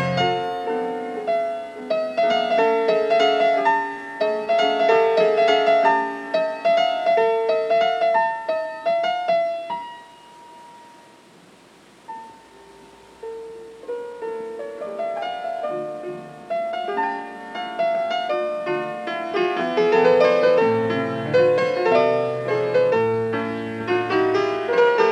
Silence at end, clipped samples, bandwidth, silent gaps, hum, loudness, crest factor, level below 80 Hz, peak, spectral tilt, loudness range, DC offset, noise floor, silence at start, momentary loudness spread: 0 s; under 0.1%; 10 kHz; none; none; -21 LUFS; 16 dB; -66 dBFS; -6 dBFS; -5.5 dB/octave; 14 LU; under 0.1%; -50 dBFS; 0 s; 14 LU